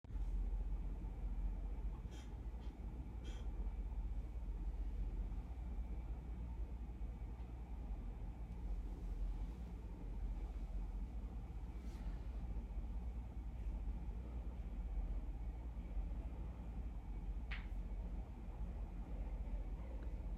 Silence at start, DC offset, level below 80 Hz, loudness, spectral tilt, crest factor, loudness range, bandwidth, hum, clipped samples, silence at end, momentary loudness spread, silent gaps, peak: 0.05 s; under 0.1%; -46 dBFS; -49 LUFS; -8 dB/octave; 14 dB; 1 LU; 6 kHz; none; under 0.1%; 0 s; 4 LU; none; -32 dBFS